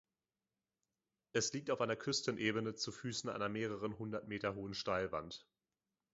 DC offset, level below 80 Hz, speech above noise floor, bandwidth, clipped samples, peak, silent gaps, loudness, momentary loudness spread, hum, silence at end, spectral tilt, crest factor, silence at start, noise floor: under 0.1%; -70 dBFS; over 50 dB; 7.6 kHz; under 0.1%; -20 dBFS; none; -40 LUFS; 6 LU; none; 0.7 s; -3.5 dB/octave; 22 dB; 1.35 s; under -90 dBFS